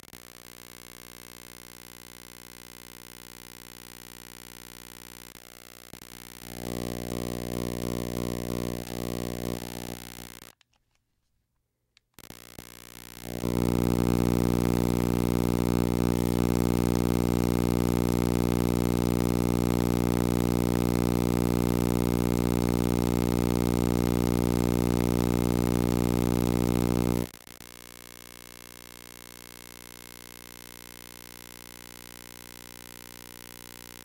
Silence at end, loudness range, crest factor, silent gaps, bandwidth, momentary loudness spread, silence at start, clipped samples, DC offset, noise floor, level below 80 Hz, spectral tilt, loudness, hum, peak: 6.7 s; 19 LU; 18 dB; none; 17 kHz; 19 LU; 0.15 s; under 0.1%; under 0.1%; -78 dBFS; -40 dBFS; -6.5 dB/octave; -27 LUFS; 60 Hz at -30 dBFS; -12 dBFS